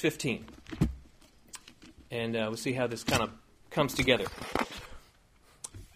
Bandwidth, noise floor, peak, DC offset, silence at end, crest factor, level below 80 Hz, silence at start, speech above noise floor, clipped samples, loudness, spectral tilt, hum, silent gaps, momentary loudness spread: 15.5 kHz; -62 dBFS; -8 dBFS; under 0.1%; 0.1 s; 26 dB; -50 dBFS; 0 s; 31 dB; under 0.1%; -32 LUFS; -4.5 dB/octave; none; none; 21 LU